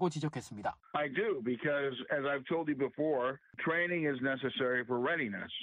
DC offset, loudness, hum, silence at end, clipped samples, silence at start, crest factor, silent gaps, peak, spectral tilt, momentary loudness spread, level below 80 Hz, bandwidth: under 0.1%; -34 LUFS; none; 0 s; under 0.1%; 0 s; 16 dB; none; -20 dBFS; -6 dB/octave; 6 LU; -74 dBFS; 10.5 kHz